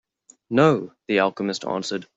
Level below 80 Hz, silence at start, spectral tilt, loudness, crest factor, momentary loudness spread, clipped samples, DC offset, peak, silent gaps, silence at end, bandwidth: -64 dBFS; 0.5 s; -5.5 dB/octave; -22 LUFS; 18 dB; 9 LU; under 0.1%; under 0.1%; -4 dBFS; none; 0.15 s; 8 kHz